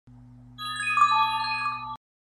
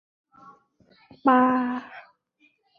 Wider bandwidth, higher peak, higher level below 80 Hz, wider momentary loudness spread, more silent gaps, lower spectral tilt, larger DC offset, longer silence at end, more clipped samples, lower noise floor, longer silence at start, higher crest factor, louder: first, 14.5 kHz vs 4.9 kHz; second, -10 dBFS vs -6 dBFS; first, -60 dBFS vs -74 dBFS; second, 17 LU vs 25 LU; neither; second, -1 dB/octave vs -7.5 dB/octave; neither; second, 0.4 s vs 0.8 s; neither; second, -49 dBFS vs -66 dBFS; second, 0.05 s vs 1.25 s; about the same, 18 dB vs 22 dB; second, -25 LUFS vs -22 LUFS